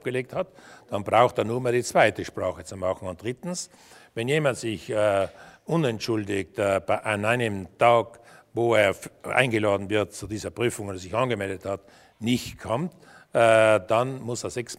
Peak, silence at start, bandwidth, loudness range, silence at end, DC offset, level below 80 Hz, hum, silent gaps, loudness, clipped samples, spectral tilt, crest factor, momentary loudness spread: -4 dBFS; 0.05 s; 16 kHz; 4 LU; 0.05 s; under 0.1%; -60 dBFS; none; none; -25 LUFS; under 0.1%; -5 dB/octave; 22 dB; 13 LU